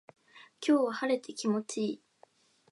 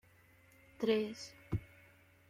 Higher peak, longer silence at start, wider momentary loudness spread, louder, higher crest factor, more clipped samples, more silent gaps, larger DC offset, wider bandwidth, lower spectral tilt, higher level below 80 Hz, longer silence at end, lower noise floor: first, -16 dBFS vs -22 dBFS; second, 0.35 s vs 0.8 s; second, 9 LU vs 15 LU; first, -31 LUFS vs -38 LUFS; about the same, 18 dB vs 18 dB; neither; neither; neither; second, 11.5 kHz vs 16 kHz; second, -4.5 dB/octave vs -6 dB/octave; second, -88 dBFS vs -62 dBFS; about the same, 0.75 s vs 0.65 s; about the same, -65 dBFS vs -65 dBFS